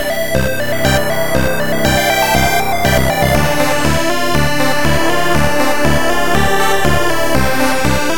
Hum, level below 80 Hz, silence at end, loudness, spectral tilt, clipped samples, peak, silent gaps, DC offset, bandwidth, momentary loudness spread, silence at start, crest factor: none; -26 dBFS; 0 s; -14 LUFS; -4 dB/octave; under 0.1%; 0 dBFS; none; 20%; 17.5 kHz; 3 LU; 0 s; 14 dB